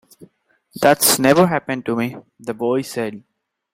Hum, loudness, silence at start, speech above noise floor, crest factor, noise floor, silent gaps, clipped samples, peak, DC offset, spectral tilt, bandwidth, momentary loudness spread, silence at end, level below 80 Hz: none; -17 LUFS; 0.2 s; 41 dB; 20 dB; -59 dBFS; none; under 0.1%; 0 dBFS; under 0.1%; -3.5 dB/octave; 16 kHz; 15 LU; 0.55 s; -58 dBFS